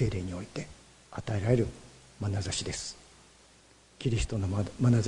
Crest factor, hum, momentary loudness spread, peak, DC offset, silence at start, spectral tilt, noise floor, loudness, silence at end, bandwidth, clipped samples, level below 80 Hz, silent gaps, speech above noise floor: 20 dB; none; 17 LU; -10 dBFS; under 0.1%; 0 s; -6 dB/octave; -59 dBFS; -32 LUFS; 0 s; 11 kHz; under 0.1%; -48 dBFS; none; 29 dB